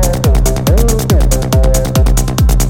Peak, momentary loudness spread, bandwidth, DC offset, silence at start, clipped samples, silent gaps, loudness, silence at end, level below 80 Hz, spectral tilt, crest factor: 0 dBFS; 1 LU; 17 kHz; under 0.1%; 0 s; under 0.1%; none; -12 LUFS; 0 s; -12 dBFS; -5.5 dB/octave; 10 dB